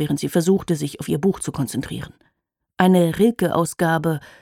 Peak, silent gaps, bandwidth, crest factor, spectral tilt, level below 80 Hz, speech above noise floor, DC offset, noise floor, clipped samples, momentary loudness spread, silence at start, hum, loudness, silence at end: -2 dBFS; none; 16.5 kHz; 18 dB; -6 dB/octave; -50 dBFS; 54 dB; under 0.1%; -74 dBFS; under 0.1%; 10 LU; 0 s; none; -20 LUFS; 0.15 s